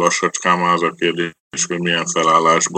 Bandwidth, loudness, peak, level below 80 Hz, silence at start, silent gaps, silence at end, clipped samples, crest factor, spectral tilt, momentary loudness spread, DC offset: 9.2 kHz; -17 LUFS; 0 dBFS; -64 dBFS; 0 s; 1.40-1.51 s; 0 s; under 0.1%; 16 dB; -3 dB/octave; 8 LU; under 0.1%